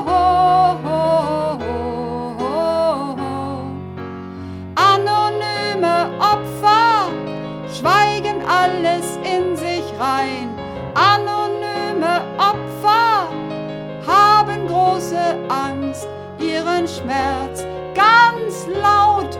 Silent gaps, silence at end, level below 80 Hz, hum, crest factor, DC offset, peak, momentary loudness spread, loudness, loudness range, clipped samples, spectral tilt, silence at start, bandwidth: none; 0 s; -46 dBFS; none; 16 dB; under 0.1%; -2 dBFS; 14 LU; -17 LUFS; 4 LU; under 0.1%; -4.5 dB/octave; 0 s; 17 kHz